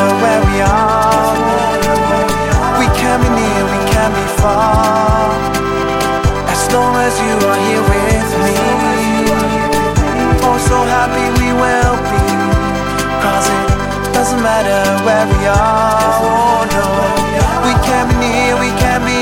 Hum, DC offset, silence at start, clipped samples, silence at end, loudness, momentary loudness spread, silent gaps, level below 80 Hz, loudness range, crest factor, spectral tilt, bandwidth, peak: none; under 0.1%; 0 s; under 0.1%; 0 s; -12 LUFS; 3 LU; none; -22 dBFS; 1 LU; 12 dB; -5 dB/octave; 17 kHz; 0 dBFS